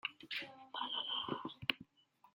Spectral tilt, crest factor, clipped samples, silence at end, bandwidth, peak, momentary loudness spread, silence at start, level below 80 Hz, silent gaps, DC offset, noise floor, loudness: -4.5 dB/octave; 32 dB; under 0.1%; 0.05 s; 16.5 kHz; -12 dBFS; 7 LU; 0.05 s; -80 dBFS; none; under 0.1%; -71 dBFS; -41 LUFS